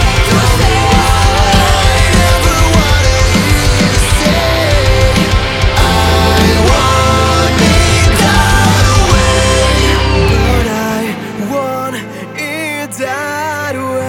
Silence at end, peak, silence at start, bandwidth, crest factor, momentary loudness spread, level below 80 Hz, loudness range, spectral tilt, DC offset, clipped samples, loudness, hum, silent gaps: 0 s; 0 dBFS; 0 s; 17 kHz; 10 dB; 9 LU; -16 dBFS; 6 LU; -4.5 dB/octave; under 0.1%; under 0.1%; -10 LUFS; none; none